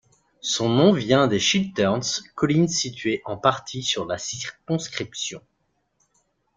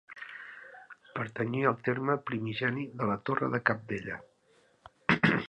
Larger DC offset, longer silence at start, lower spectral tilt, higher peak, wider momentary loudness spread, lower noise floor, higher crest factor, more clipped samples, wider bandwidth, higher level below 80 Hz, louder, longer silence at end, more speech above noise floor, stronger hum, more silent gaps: neither; first, 0.45 s vs 0.1 s; second, -4 dB/octave vs -7.5 dB/octave; first, -2 dBFS vs -6 dBFS; second, 12 LU vs 16 LU; first, -71 dBFS vs -66 dBFS; about the same, 22 dB vs 26 dB; neither; about the same, 9.6 kHz vs 9.2 kHz; first, -58 dBFS vs -66 dBFS; first, -23 LUFS vs -31 LUFS; first, 1.15 s vs 0 s; first, 48 dB vs 35 dB; neither; neither